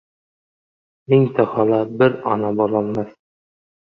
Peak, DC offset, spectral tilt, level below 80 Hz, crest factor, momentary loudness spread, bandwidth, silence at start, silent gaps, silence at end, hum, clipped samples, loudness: -2 dBFS; under 0.1%; -10 dB/octave; -60 dBFS; 18 dB; 8 LU; 5 kHz; 1.1 s; none; 0.9 s; none; under 0.1%; -18 LUFS